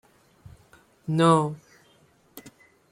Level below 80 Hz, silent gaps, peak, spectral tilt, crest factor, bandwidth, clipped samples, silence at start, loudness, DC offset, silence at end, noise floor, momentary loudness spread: -64 dBFS; none; -6 dBFS; -6.5 dB/octave; 22 dB; 15.5 kHz; under 0.1%; 1.1 s; -22 LUFS; under 0.1%; 0.5 s; -61 dBFS; 27 LU